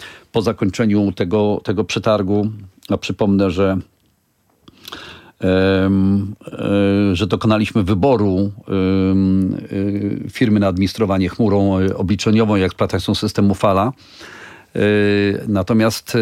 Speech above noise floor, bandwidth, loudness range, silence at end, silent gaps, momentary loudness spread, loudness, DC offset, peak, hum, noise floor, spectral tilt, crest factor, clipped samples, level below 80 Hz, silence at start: 45 dB; 14.5 kHz; 3 LU; 0 s; none; 10 LU; -17 LUFS; under 0.1%; -2 dBFS; none; -61 dBFS; -7 dB/octave; 14 dB; under 0.1%; -50 dBFS; 0 s